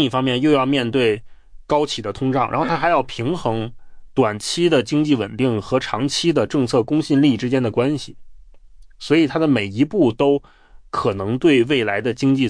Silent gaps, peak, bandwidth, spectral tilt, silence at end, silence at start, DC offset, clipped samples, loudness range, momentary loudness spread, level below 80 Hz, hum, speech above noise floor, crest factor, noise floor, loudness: none; -4 dBFS; 10.5 kHz; -6 dB/octave; 0 s; 0 s; under 0.1%; under 0.1%; 2 LU; 7 LU; -48 dBFS; none; 25 dB; 14 dB; -43 dBFS; -19 LUFS